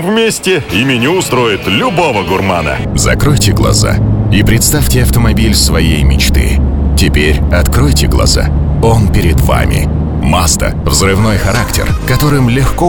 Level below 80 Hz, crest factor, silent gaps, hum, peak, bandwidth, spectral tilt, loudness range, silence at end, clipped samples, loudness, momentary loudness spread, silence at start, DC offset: -14 dBFS; 10 dB; none; none; 0 dBFS; 19.5 kHz; -5 dB/octave; 2 LU; 0 s; under 0.1%; -10 LUFS; 3 LU; 0 s; 2%